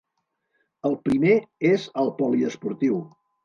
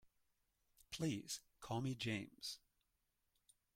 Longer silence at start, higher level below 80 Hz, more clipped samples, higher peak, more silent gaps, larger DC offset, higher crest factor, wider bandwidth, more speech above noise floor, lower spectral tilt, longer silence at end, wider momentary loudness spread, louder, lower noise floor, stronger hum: about the same, 0.85 s vs 0.9 s; first, -62 dBFS vs -76 dBFS; neither; first, -8 dBFS vs -30 dBFS; neither; neither; about the same, 16 dB vs 20 dB; second, 9.8 kHz vs 16.5 kHz; first, 55 dB vs 41 dB; first, -7.5 dB/octave vs -4.5 dB/octave; second, 0.4 s vs 1.2 s; about the same, 8 LU vs 8 LU; first, -23 LUFS vs -46 LUFS; second, -77 dBFS vs -86 dBFS; neither